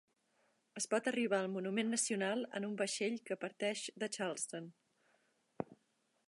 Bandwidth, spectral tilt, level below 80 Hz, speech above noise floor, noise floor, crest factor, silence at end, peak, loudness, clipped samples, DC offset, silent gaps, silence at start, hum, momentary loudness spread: 11.5 kHz; -3 dB/octave; -88 dBFS; 41 dB; -79 dBFS; 20 dB; 0.55 s; -22 dBFS; -39 LUFS; under 0.1%; under 0.1%; none; 0.75 s; none; 13 LU